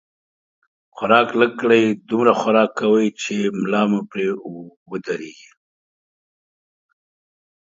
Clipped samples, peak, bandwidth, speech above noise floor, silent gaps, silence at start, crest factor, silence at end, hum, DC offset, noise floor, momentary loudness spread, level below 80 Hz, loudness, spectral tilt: under 0.1%; 0 dBFS; 7.8 kHz; over 71 dB; 4.76-4.86 s; 0.95 s; 20 dB; 2.35 s; none; under 0.1%; under -90 dBFS; 15 LU; -68 dBFS; -18 LUFS; -5.5 dB/octave